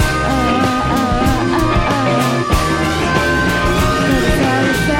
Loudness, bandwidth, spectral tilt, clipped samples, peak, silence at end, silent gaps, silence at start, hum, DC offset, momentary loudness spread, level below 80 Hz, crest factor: -14 LUFS; 17 kHz; -5 dB/octave; under 0.1%; -2 dBFS; 0 s; none; 0 s; none; under 0.1%; 1 LU; -24 dBFS; 12 dB